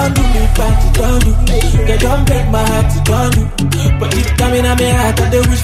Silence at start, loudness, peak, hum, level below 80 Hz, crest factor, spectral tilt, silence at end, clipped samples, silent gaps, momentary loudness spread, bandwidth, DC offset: 0 s; -13 LUFS; 0 dBFS; none; -14 dBFS; 10 dB; -5.5 dB/octave; 0 s; under 0.1%; none; 2 LU; 15.5 kHz; under 0.1%